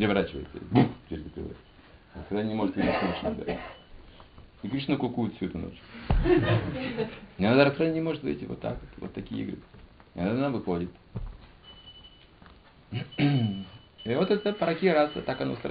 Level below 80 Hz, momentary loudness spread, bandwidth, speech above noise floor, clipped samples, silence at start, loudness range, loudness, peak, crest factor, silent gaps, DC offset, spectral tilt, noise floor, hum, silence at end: -42 dBFS; 18 LU; 5 kHz; 26 dB; under 0.1%; 0 s; 7 LU; -29 LUFS; -8 dBFS; 20 dB; none; under 0.1%; -5.5 dB/octave; -54 dBFS; none; 0 s